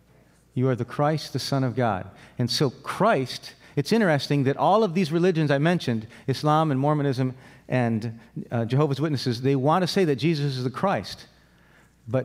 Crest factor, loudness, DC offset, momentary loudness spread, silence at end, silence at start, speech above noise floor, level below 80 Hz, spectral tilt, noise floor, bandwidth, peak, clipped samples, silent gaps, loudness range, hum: 16 dB; -24 LUFS; under 0.1%; 9 LU; 0 s; 0.55 s; 34 dB; -64 dBFS; -6.5 dB/octave; -57 dBFS; 15.5 kHz; -8 dBFS; under 0.1%; none; 3 LU; none